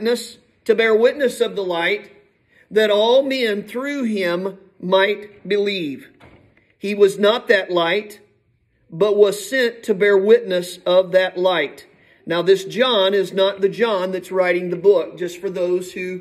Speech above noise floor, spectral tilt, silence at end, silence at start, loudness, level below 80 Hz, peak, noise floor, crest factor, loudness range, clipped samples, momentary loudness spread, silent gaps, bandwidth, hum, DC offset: 44 dB; -4.5 dB/octave; 0 s; 0 s; -18 LUFS; -68 dBFS; -2 dBFS; -62 dBFS; 18 dB; 3 LU; under 0.1%; 11 LU; none; 14 kHz; none; under 0.1%